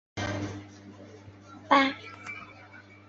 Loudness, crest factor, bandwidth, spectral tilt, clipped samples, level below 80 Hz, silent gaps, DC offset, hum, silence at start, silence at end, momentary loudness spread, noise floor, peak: -28 LUFS; 26 dB; 7.8 kHz; -5 dB/octave; under 0.1%; -58 dBFS; none; under 0.1%; none; 0.15 s; 0.3 s; 26 LU; -51 dBFS; -6 dBFS